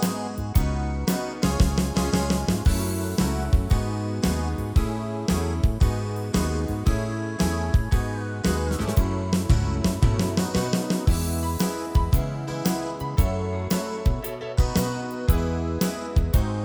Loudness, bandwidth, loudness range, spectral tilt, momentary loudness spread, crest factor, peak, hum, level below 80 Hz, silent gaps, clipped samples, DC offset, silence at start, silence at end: -25 LUFS; over 20 kHz; 2 LU; -6 dB/octave; 4 LU; 18 dB; -6 dBFS; none; -28 dBFS; none; under 0.1%; under 0.1%; 0 s; 0 s